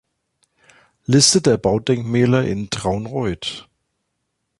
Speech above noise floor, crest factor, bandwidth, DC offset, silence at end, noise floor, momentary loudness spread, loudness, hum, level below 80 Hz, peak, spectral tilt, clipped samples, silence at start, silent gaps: 57 dB; 20 dB; 11.5 kHz; under 0.1%; 0.95 s; -74 dBFS; 15 LU; -18 LUFS; none; -46 dBFS; 0 dBFS; -4.5 dB/octave; under 0.1%; 1.1 s; none